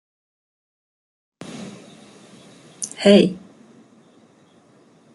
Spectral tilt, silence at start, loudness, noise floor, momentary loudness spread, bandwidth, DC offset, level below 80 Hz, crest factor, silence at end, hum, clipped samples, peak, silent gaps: -5 dB/octave; 1.5 s; -17 LUFS; -54 dBFS; 26 LU; 11.5 kHz; under 0.1%; -66 dBFS; 22 dB; 1.75 s; none; under 0.1%; -2 dBFS; none